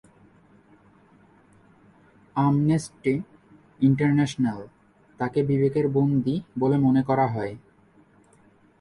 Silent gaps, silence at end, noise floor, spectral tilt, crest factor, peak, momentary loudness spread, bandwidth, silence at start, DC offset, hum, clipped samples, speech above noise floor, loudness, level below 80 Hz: none; 1.25 s; -58 dBFS; -8 dB/octave; 16 dB; -8 dBFS; 11 LU; 11.5 kHz; 2.35 s; under 0.1%; none; under 0.1%; 35 dB; -24 LUFS; -60 dBFS